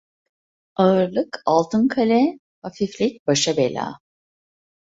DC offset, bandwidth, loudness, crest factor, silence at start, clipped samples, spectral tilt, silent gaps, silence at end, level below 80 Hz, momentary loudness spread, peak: under 0.1%; 8 kHz; -20 LUFS; 18 dB; 0.8 s; under 0.1%; -5 dB/octave; 2.39-2.62 s, 3.19-3.26 s; 0.9 s; -62 dBFS; 13 LU; -4 dBFS